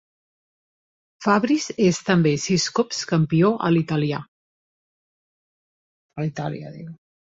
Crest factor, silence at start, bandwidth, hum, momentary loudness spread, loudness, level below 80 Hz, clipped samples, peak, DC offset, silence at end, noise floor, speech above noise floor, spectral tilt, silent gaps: 20 dB; 1.2 s; 8 kHz; none; 15 LU; -21 LUFS; -60 dBFS; under 0.1%; -4 dBFS; under 0.1%; 0.35 s; under -90 dBFS; over 69 dB; -5.5 dB/octave; 4.28-6.09 s